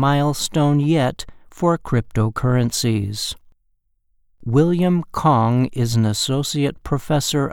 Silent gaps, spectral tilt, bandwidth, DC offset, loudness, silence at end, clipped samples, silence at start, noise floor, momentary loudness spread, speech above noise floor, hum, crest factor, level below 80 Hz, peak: none; -5.5 dB/octave; 18 kHz; under 0.1%; -19 LUFS; 0 s; under 0.1%; 0 s; -65 dBFS; 9 LU; 47 dB; none; 16 dB; -42 dBFS; -4 dBFS